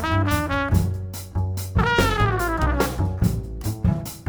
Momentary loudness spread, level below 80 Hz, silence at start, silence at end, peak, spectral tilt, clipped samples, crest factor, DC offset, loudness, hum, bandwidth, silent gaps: 9 LU; -30 dBFS; 0 s; 0 s; -4 dBFS; -6 dB/octave; under 0.1%; 18 dB; under 0.1%; -23 LUFS; none; over 20 kHz; none